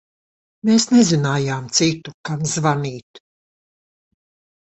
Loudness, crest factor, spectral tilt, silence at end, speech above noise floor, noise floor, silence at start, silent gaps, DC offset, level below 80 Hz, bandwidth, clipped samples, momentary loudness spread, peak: -18 LUFS; 18 dB; -4.5 dB/octave; 1.5 s; over 72 dB; under -90 dBFS; 0.65 s; 2.14-2.24 s, 3.03-3.14 s; under 0.1%; -58 dBFS; 8.4 kHz; under 0.1%; 14 LU; -2 dBFS